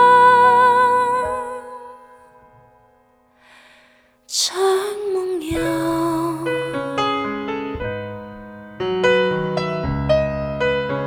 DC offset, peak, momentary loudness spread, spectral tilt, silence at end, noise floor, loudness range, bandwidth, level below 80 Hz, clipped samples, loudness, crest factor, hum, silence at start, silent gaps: under 0.1%; -4 dBFS; 18 LU; -4.5 dB/octave; 0 s; -56 dBFS; 7 LU; 17 kHz; -42 dBFS; under 0.1%; -19 LUFS; 16 dB; none; 0 s; none